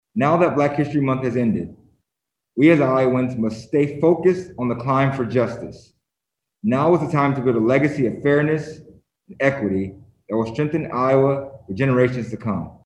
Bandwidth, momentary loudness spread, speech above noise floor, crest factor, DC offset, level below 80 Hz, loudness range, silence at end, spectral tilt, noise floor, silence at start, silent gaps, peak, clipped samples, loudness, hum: 10 kHz; 10 LU; 64 dB; 18 dB; under 0.1%; -54 dBFS; 3 LU; 0.15 s; -8.5 dB/octave; -84 dBFS; 0.15 s; none; -2 dBFS; under 0.1%; -20 LUFS; none